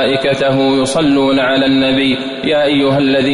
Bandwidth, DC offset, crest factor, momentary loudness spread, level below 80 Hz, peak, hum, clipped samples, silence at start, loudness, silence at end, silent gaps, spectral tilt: 11 kHz; under 0.1%; 8 dB; 2 LU; -44 dBFS; -4 dBFS; none; under 0.1%; 0 s; -12 LUFS; 0 s; none; -5 dB/octave